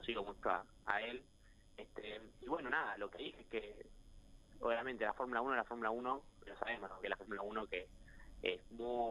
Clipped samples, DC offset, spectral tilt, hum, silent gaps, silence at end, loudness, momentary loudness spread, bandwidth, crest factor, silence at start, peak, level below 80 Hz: under 0.1%; under 0.1%; -5 dB/octave; none; none; 0 s; -43 LUFS; 15 LU; 12.5 kHz; 26 dB; 0 s; -16 dBFS; -64 dBFS